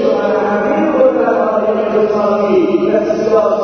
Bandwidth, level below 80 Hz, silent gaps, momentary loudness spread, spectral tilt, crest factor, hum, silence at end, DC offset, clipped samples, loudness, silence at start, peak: 6.6 kHz; -50 dBFS; none; 3 LU; -7 dB/octave; 12 dB; none; 0 s; under 0.1%; under 0.1%; -13 LUFS; 0 s; 0 dBFS